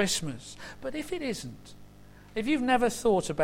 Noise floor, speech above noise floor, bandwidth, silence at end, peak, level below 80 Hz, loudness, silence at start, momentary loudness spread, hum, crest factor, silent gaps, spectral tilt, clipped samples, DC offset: -51 dBFS; 22 dB; 16.5 kHz; 0 s; -14 dBFS; -52 dBFS; -29 LUFS; 0 s; 17 LU; 50 Hz at -55 dBFS; 16 dB; none; -4 dB/octave; under 0.1%; under 0.1%